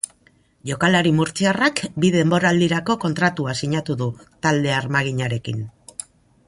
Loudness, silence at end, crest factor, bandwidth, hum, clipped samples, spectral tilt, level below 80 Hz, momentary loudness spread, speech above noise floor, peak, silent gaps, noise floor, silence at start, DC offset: -20 LUFS; 0.45 s; 16 dB; 11.5 kHz; none; under 0.1%; -5 dB/octave; -54 dBFS; 14 LU; 38 dB; -4 dBFS; none; -58 dBFS; 0.65 s; under 0.1%